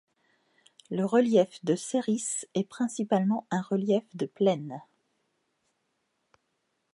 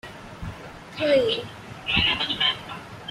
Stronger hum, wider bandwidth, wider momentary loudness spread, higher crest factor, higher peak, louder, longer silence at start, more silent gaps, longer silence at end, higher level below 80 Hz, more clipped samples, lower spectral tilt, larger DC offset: neither; second, 11.5 kHz vs 14 kHz; second, 9 LU vs 18 LU; about the same, 20 dB vs 20 dB; second, -10 dBFS vs -6 dBFS; second, -28 LUFS vs -23 LUFS; first, 0.9 s vs 0.05 s; neither; first, 2.1 s vs 0 s; second, -80 dBFS vs -48 dBFS; neither; about the same, -5.5 dB/octave vs -4.5 dB/octave; neither